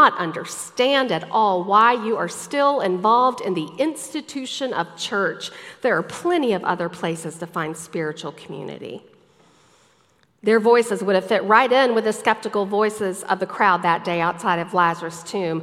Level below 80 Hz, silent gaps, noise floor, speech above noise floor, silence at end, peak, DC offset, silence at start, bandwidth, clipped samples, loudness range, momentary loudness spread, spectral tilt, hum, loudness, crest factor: -72 dBFS; none; -60 dBFS; 40 dB; 0 s; 0 dBFS; under 0.1%; 0 s; 15 kHz; under 0.1%; 8 LU; 14 LU; -4 dB/octave; none; -21 LUFS; 20 dB